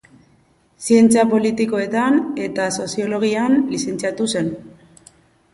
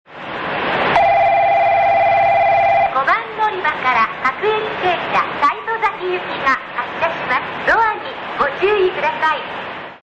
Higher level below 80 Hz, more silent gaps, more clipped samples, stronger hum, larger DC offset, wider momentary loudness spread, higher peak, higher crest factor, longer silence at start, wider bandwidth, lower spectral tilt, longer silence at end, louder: second, -58 dBFS vs -50 dBFS; neither; neither; neither; neither; about the same, 10 LU vs 9 LU; about the same, -2 dBFS vs -4 dBFS; about the same, 16 dB vs 12 dB; first, 0.8 s vs 0.1 s; first, 11.5 kHz vs 8.2 kHz; about the same, -4.5 dB/octave vs -5 dB/octave; first, 0.85 s vs 0.05 s; about the same, -18 LUFS vs -16 LUFS